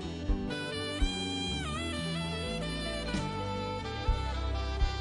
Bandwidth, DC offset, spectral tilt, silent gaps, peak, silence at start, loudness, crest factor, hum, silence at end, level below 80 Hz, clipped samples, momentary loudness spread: 11 kHz; under 0.1%; -5 dB/octave; none; -16 dBFS; 0 s; -34 LUFS; 16 dB; none; 0 s; -36 dBFS; under 0.1%; 2 LU